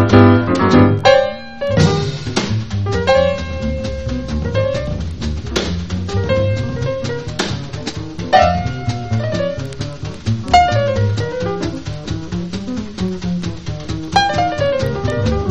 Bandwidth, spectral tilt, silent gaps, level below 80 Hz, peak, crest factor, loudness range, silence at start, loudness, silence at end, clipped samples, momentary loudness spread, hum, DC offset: 8.6 kHz; -6 dB/octave; none; -30 dBFS; 0 dBFS; 16 dB; 6 LU; 0 s; -17 LUFS; 0 s; under 0.1%; 13 LU; none; 1%